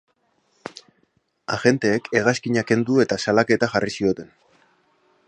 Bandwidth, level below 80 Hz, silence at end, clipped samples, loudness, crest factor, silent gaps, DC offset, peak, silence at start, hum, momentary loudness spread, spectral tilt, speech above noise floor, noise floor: 10 kHz; -58 dBFS; 1.05 s; under 0.1%; -21 LUFS; 20 dB; none; under 0.1%; -2 dBFS; 0.65 s; none; 20 LU; -5.5 dB/octave; 46 dB; -67 dBFS